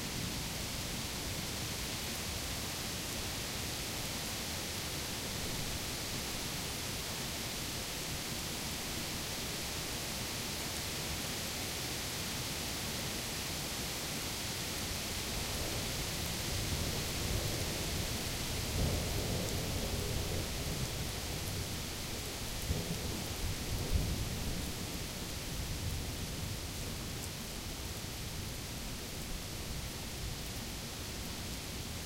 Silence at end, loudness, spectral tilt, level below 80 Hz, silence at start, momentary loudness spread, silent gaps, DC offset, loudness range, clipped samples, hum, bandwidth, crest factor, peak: 0 s; -38 LUFS; -3 dB/octave; -46 dBFS; 0 s; 5 LU; none; under 0.1%; 5 LU; under 0.1%; none; 16 kHz; 18 dB; -20 dBFS